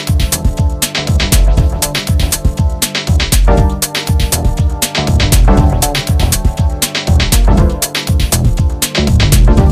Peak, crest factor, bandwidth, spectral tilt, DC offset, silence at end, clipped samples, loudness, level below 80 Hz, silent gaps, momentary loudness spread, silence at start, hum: 0 dBFS; 10 dB; 16 kHz; -4.5 dB/octave; under 0.1%; 0 s; under 0.1%; -12 LUFS; -14 dBFS; none; 5 LU; 0 s; none